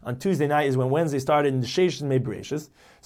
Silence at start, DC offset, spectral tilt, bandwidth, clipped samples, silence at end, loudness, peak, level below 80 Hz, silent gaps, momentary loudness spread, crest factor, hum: 0.05 s; under 0.1%; -6.5 dB/octave; 15.5 kHz; under 0.1%; 0.4 s; -24 LUFS; -10 dBFS; -60 dBFS; none; 9 LU; 14 dB; none